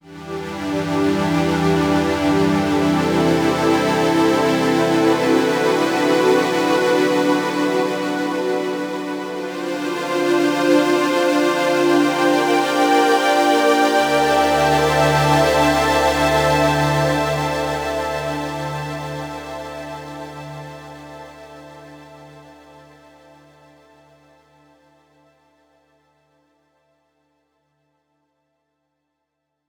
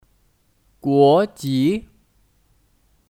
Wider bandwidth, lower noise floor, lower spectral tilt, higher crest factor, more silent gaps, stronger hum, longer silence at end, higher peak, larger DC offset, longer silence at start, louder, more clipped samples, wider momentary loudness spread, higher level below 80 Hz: first, over 20 kHz vs 16 kHz; first, -76 dBFS vs -62 dBFS; second, -5 dB/octave vs -7 dB/octave; about the same, 16 dB vs 18 dB; neither; neither; first, 7.15 s vs 1.35 s; about the same, -4 dBFS vs -4 dBFS; neither; second, 0.05 s vs 0.85 s; about the same, -17 LUFS vs -18 LUFS; neither; about the same, 14 LU vs 13 LU; first, -44 dBFS vs -56 dBFS